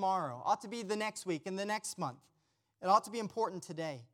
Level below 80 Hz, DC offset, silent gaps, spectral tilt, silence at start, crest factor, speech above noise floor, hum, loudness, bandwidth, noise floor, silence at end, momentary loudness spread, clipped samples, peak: -86 dBFS; under 0.1%; none; -4 dB/octave; 0 s; 22 dB; 43 dB; none; -36 LUFS; 16.5 kHz; -79 dBFS; 0.1 s; 11 LU; under 0.1%; -14 dBFS